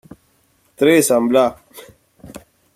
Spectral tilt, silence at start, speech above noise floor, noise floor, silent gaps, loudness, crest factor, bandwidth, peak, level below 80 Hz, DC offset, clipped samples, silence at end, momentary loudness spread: -4 dB/octave; 0.8 s; 44 dB; -59 dBFS; none; -15 LUFS; 18 dB; 16 kHz; -2 dBFS; -56 dBFS; under 0.1%; under 0.1%; 0.4 s; 5 LU